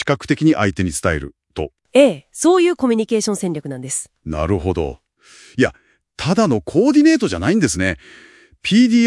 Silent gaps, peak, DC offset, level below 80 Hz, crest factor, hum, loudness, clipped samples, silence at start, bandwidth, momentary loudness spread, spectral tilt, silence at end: none; 0 dBFS; under 0.1%; -42 dBFS; 16 dB; none; -17 LUFS; under 0.1%; 0 s; 12 kHz; 13 LU; -5 dB/octave; 0 s